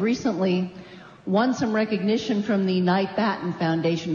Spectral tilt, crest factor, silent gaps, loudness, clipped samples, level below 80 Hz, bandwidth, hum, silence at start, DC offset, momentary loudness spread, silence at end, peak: -6.5 dB/octave; 14 dB; none; -24 LUFS; under 0.1%; -62 dBFS; 7.2 kHz; none; 0 s; under 0.1%; 7 LU; 0 s; -10 dBFS